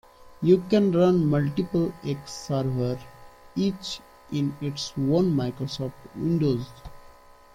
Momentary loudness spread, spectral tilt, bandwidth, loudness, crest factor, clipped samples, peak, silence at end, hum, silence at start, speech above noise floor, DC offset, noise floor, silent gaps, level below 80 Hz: 14 LU; -7 dB/octave; 16 kHz; -26 LUFS; 18 dB; under 0.1%; -6 dBFS; 0.45 s; none; 0.25 s; 26 dB; under 0.1%; -50 dBFS; none; -52 dBFS